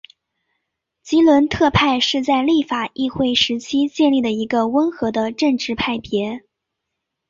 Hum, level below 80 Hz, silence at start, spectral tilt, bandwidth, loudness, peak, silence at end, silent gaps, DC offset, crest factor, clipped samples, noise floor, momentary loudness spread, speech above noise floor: none; -46 dBFS; 1.05 s; -5 dB/octave; 7.6 kHz; -18 LUFS; -2 dBFS; 0.9 s; none; under 0.1%; 16 dB; under 0.1%; -79 dBFS; 8 LU; 62 dB